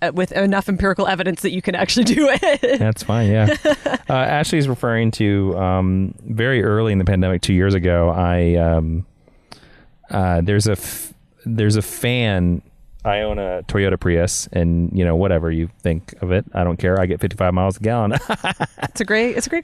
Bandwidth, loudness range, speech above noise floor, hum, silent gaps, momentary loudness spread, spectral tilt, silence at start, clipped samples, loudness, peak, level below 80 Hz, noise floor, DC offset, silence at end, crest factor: 14 kHz; 3 LU; 30 dB; none; none; 7 LU; -6 dB/octave; 0 s; under 0.1%; -18 LUFS; -6 dBFS; -38 dBFS; -48 dBFS; under 0.1%; 0 s; 12 dB